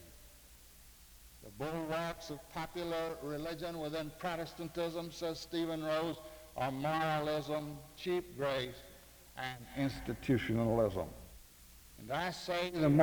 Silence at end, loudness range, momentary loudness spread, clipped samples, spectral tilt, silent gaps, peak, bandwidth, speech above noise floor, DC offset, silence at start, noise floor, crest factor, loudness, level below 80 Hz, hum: 0 s; 4 LU; 23 LU; under 0.1%; -6 dB/octave; none; -16 dBFS; over 20 kHz; 22 dB; under 0.1%; 0 s; -58 dBFS; 22 dB; -38 LUFS; -58 dBFS; none